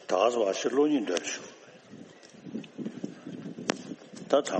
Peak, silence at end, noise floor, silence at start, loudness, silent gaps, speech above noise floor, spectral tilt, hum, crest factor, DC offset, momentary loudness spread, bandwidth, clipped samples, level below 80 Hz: -6 dBFS; 0 s; -50 dBFS; 0 s; -30 LUFS; none; 23 dB; -4 dB/octave; none; 24 dB; under 0.1%; 23 LU; 8.4 kHz; under 0.1%; -80 dBFS